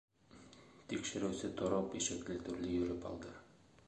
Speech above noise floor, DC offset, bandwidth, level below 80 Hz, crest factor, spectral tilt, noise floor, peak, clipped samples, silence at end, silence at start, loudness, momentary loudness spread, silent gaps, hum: 21 dB; under 0.1%; 10.5 kHz; -62 dBFS; 20 dB; -4 dB/octave; -61 dBFS; -22 dBFS; under 0.1%; 0.4 s; 0.3 s; -40 LUFS; 21 LU; none; none